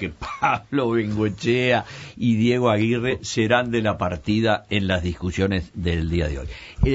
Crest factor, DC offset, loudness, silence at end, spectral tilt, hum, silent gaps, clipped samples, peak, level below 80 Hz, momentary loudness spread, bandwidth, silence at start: 18 dB; under 0.1%; -22 LUFS; 0 s; -6 dB/octave; none; none; under 0.1%; -4 dBFS; -36 dBFS; 6 LU; 8 kHz; 0 s